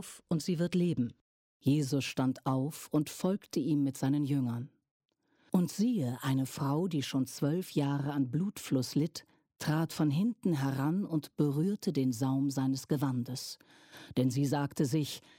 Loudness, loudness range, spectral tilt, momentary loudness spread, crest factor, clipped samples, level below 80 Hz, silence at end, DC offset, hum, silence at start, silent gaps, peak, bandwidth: -33 LUFS; 2 LU; -6.5 dB/octave; 6 LU; 16 dB; under 0.1%; -72 dBFS; 0.2 s; under 0.1%; none; 0 s; 1.21-1.60 s, 4.91-5.00 s; -18 dBFS; 17 kHz